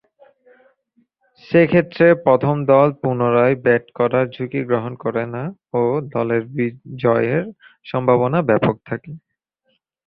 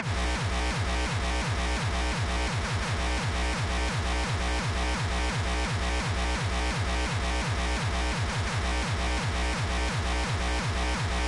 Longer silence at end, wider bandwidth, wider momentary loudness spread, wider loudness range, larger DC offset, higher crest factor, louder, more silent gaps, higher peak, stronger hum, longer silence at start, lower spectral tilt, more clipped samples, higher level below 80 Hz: first, 0.9 s vs 0 s; second, 5.4 kHz vs 11.5 kHz; first, 11 LU vs 0 LU; first, 5 LU vs 0 LU; neither; first, 18 dB vs 10 dB; first, -18 LUFS vs -29 LUFS; neither; first, -2 dBFS vs -18 dBFS; neither; first, 1.5 s vs 0 s; first, -11 dB/octave vs -4.5 dB/octave; neither; second, -56 dBFS vs -32 dBFS